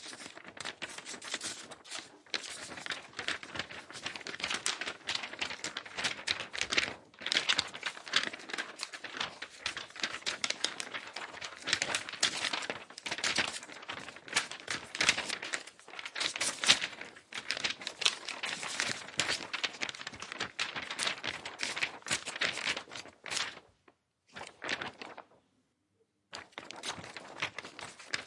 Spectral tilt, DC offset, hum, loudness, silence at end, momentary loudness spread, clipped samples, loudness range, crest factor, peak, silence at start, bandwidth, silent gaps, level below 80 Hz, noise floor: 0 dB/octave; under 0.1%; none; -35 LUFS; 0 s; 13 LU; under 0.1%; 9 LU; 30 dB; -8 dBFS; 0 s; 11.5 kHz; none; -74 dBFS; -76 dBFS